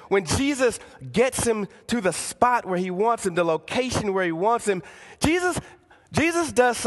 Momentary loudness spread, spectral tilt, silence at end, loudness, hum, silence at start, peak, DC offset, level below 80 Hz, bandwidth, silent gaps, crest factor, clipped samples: 7 LU; -4 dB/octave; 0 s; -23 LUFS; none; 0 s; -4 dBFS; under 0.1%; -46 dBFS; 12.5 kHz; none; 20 dB; under 0.1%